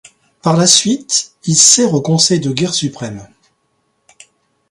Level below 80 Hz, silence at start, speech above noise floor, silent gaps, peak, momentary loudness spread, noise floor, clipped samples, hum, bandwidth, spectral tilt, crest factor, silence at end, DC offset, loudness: -56 dBFS; 0.45 s; 51 dB; none; 0 dBFS; 15 LU; -64 dBFS; under 0.1%; none; 16 kHz; -3 dB/octave; 16 dB; 1.45 s; under 0.1%; -11 LUFS